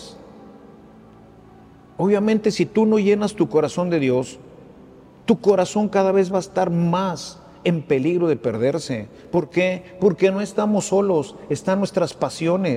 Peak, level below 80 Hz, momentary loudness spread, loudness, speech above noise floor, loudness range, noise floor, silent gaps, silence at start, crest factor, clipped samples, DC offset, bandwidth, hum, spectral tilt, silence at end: -4 dBFS; -58 dBFS; 8 LU; -20 LUFS; 27 dB; 2 LU; -47 dBFS; none; 0 s; 18 dB; under 0.1%; under 0.1%; 11.5 kHz; none; -6.5 dB/octave; 0 s